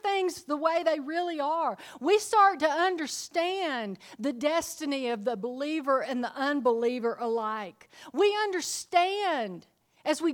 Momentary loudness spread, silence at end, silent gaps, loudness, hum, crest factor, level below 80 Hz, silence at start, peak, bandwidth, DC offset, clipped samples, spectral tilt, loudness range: 9 LU; 0 s; none; -28 LUFS; none; 20 dB; -74 dBFS; 0.05 s; -8 dBFS; 19.5 kHz; under 0.1%; under 0.1%; -3 dB/octave; 3 LU